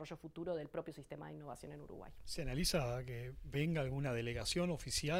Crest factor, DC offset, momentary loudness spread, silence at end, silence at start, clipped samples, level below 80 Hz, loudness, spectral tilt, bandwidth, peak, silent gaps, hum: 18 dB; under 0.1%; 14 LU; 0 s; 0 s; under 0.1%; -54 dBFS; -41 LUFS; -4.5 dB/octave; 16 kHz; -24 dBFS; none; none